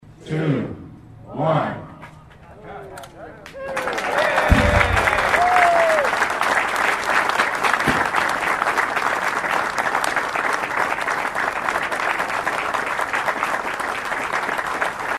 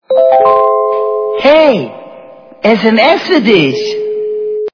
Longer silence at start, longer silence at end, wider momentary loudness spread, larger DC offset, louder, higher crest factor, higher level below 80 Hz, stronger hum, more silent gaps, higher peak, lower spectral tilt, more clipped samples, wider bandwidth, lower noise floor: about the same, 0.05 s vs 0.1 s; about the same, 0 s vs 0.05 s; first, 16 LU vs 9 LU; neither; second, -20 LUFS vs -10 LUFS; first, 20 dB vs 10 dB; first, -36 dBFS vs -52 dBFS; neither; neither; about the same, -2 dBFS vs 0 dBFS; second, -4 dB/octave vs -6 dB/octave; second, under 0.1% vs 0.7%; first, 15.5 kHz vs 5.4 kHz; first, -43 dBFS vs -34 dBFS